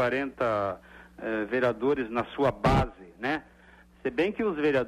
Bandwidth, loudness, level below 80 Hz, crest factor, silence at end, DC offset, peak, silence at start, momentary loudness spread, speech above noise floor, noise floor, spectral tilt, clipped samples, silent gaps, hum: 13.5 kHz; -29 LUFS; -44 dBFS; 16 dB; 0 s; under 0.1%; -12 dBFS; 0 s; 10 LU; 28 dB; -55 dBFS; -7 dB/octave; under 0.1%; none; none